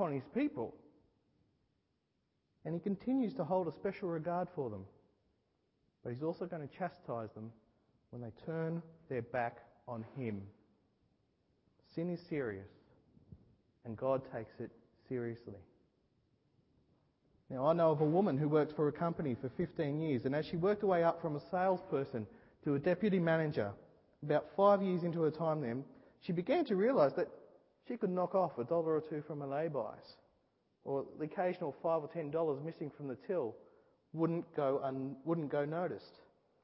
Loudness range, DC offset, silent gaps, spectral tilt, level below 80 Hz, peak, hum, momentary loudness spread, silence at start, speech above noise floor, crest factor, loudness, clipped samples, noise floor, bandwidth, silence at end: 11 LU; under 0.1%; none; -7 dB/octave; -72 dBFS; -16 dBFS; none; 16 LU; 0 s; 46 dB; 22 dB; -37 LUFS; under 0.1%; -82 dBFS; 5.6 kHz; 0.55 s